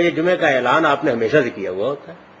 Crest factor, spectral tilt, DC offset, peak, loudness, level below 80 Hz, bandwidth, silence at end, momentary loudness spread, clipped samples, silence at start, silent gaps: 16 dB; -6 dB/octave; under 0.1%; -2 dBFS; -18 LUFS; -60 dBFS; 7.8 kHz; 0.25 s; 9 LU; under 0.1%; 0 s; none